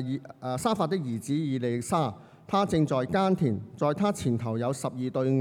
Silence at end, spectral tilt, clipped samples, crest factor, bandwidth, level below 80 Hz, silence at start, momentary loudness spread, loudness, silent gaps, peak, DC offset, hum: 0 s; -6.5 dB/octave; under 0.1%; 14 dB; 16 kHz; -62 dBFS; 0 s; 6 LU; -28 LUFS; none; -12 dBFS; under 0.1%; none